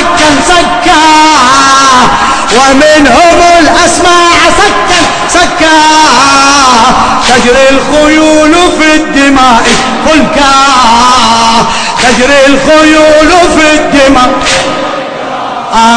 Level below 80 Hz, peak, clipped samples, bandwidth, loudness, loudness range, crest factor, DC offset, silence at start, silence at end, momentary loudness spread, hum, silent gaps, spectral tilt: -24 dBFS; 0 dBFS; 20%; 11 kHz; -3 LUFS; 1 LU; 4 dB; under 0.1%; 0 s; 0 s; 4 LU; none; none; -2.5 dB/octave